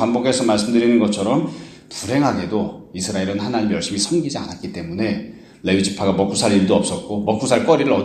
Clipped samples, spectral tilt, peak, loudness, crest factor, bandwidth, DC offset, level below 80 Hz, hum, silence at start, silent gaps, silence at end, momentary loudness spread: under 0.1%; -5 dB/octave; 0 dBFS; -19 LUFS; 18 dB; 13.5 kHz; under 0.1%; -52 dBFS; none; 0 s; none; 0 s; 12 LU